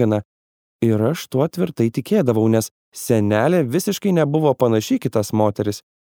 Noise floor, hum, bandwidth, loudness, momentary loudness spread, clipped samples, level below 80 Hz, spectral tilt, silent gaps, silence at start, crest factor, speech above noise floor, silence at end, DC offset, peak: under -90 dBFS; none; over 20 kHz; -19 LUFS; 7 LU; under 0.1%; -60 dBFS; -6.5 dB/octave; 0.25-0.79 s, 2.71-2.92 s; 0 s; 18 dB; over 72 dB; 0.3 s; under 0.1%; -2 dBFS